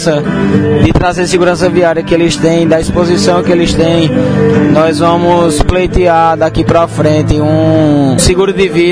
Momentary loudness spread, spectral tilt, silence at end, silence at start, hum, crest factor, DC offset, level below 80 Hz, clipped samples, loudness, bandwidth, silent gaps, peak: 2 LU; -6 dB/octave; 0 s; 0 s; none; 8 dB; 0.7%; -24 dBFS; 1%; -9 LUFS; 11 kHz; none; 0 dBFS